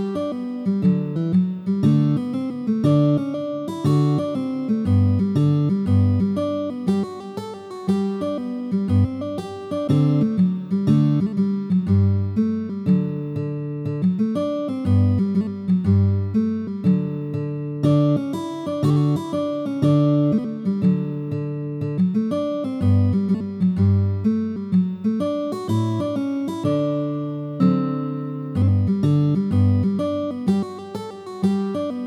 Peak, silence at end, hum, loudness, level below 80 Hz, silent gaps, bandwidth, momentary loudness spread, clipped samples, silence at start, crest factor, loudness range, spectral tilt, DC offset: -6 dBFS; 0 s; none; -21 LUFS; -54 dBFS; none; 10 kHz; 9 LU; under 0.1%; 0 s; 14 dB; 3 LU; -9.5 dB/octave; under 0.1%